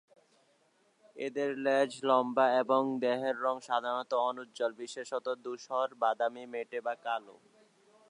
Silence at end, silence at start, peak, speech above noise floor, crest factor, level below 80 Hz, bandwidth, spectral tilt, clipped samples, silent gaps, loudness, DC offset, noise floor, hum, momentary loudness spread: 0.75 s; 1.15 s; -12 dBFS; 38 dB; 20 dB; under -90 dBFS; 10.5 kHz; -4 dB/octave; under 0.1%; none; -32 LUFS; under 0.1%; -70 dBFS; none; 11 LU